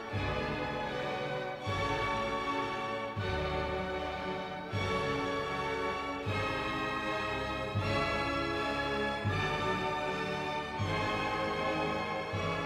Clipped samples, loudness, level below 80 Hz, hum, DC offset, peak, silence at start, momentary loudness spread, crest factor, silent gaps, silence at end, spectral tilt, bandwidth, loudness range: under 0.1%; -34 LUFS; -50 dBFS; none; under 0.1%; -18 dBFS; 0 s; 4 LU; 16 dB; none; 0 s; -5.5 dB/octave; 14.5 kHz; 2 LU